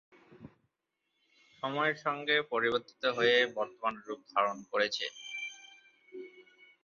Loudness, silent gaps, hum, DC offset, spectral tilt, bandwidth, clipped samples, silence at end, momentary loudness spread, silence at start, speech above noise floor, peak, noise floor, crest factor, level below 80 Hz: -32 LUFS; none; none; under 0.1%; -0.5 dB/octave; 7.2 kHz; under 0.1%; 0.45 s; 22 LU; 0.3 s; 52 dB; -14 dBFS; -84 dBFS; 20 dB; -78 dBFS